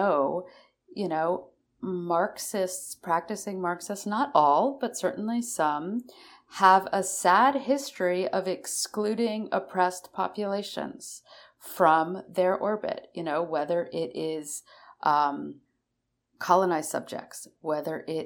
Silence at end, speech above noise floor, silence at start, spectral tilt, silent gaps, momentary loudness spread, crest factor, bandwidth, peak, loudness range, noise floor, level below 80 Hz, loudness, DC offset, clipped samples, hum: 0 s; 53 dB; 0 s; -4 dB/octave; none; 15 LU; 22 dB; 19.5 kHz; -4 dBFS; 5 LU; -80 dBFS; -76 dBFS; -27 LUFS; under 0.1%; under 0.1%; none